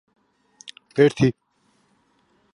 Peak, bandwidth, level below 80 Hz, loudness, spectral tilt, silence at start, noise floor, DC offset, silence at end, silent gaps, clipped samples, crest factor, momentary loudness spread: -2 dBFS; 11 kHz; -58 dBFS; -20 LUFS; -7 dB/octave; 0.95 s; -65 dBFS; under 0.1%; 1.25 s; none; under 0.1%; 22 dB; 25 LU